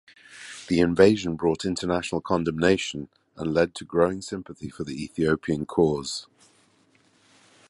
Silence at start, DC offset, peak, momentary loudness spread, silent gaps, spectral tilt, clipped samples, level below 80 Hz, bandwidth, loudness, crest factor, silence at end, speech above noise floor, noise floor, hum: 0.3 s; under 0.1%; -4 dBFS; 16 LU; none; -5.5 dB/octave; under 0.1%; -50 dBFS; 11.5 kHz; -25 LUFS; 22 dB; 1.45 s; 38 dB; -62 dBFS; none